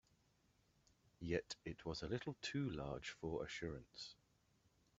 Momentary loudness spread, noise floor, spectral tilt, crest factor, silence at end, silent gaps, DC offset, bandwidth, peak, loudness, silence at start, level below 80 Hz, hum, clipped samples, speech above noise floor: 10 LU; -78 dBFS; -4.5 dB/octave; 24 dB; 0.85 s; none; under 0.1%; 8 kHz; -26 dBFS; -47 LUFS; 1.2 s; -66 dBFS; none; under 0.1%; 31 dB